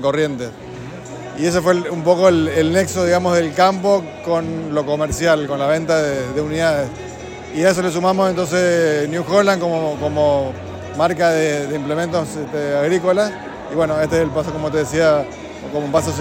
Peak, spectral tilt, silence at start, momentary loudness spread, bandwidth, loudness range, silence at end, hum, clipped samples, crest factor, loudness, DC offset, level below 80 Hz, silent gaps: 0 dBFS; -5.5 dB/octave; 0 s; 12 LU; 16.5 kHz; 3 LU; 0 s; none; under 0.1%; 16 dB; -18 LUFS; under 0.1%; -46 dBFS; none